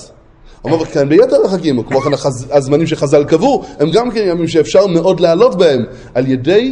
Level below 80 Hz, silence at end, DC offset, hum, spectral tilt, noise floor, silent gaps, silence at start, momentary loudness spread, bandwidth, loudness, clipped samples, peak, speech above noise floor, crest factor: -42 dBFS; 0 s; under 0.1%; none; -6 dB/octave; -40 dBFS; none; 0 s; 7 LU; 10.5 kHz; -12 LUFS; under 0.1%; 0 dBFS; 29 dB; 12 dB